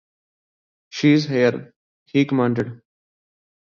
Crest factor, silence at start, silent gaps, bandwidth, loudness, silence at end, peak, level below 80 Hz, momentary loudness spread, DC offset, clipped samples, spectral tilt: 18 dB; 0.95 s; 1.76-2.06 s; 7.2 kHz; -20 LUFS; 0.85 s; -4 dBFS; -64 dBFS; 14 LU; under 0.1%; under 0.1%; -7 dB/octave